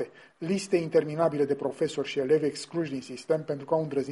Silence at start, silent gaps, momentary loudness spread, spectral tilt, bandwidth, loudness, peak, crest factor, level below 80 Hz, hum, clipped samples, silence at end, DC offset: 0 s; none; 8 LU; -6 dB/octave; 11.5 kHz; -28 LUFS; -12 dBFS; 16 dB; -70 dBFS; none; under 0.1%; 0 s; under 0.1%